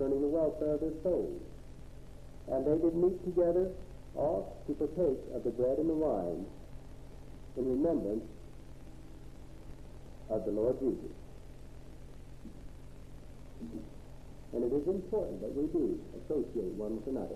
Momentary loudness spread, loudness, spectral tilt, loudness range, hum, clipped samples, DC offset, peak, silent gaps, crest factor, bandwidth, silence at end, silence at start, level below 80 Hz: 22 LU; -34 LUFS; -9 dB/octave; 7 LU; none; under 0.1%; 0.3%; -18 dBFS; none; 18 dB; 13 kHz; 0 s; 0 s; -50 dBFS